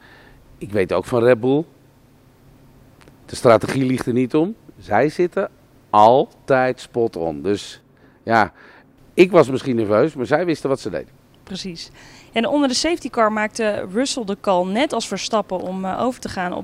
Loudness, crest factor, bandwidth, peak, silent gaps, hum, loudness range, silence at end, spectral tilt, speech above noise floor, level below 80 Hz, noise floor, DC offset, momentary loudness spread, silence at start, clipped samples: -19 LUFS; 20 dB; 15 kHz; 0 dBFS; none; none; 4 LU; 0 s; -5 dB/octave; 33 dB; -54 dBFS; -51 dBFS; under 0.1%; 14 LU; 0.6 s; under 0.1%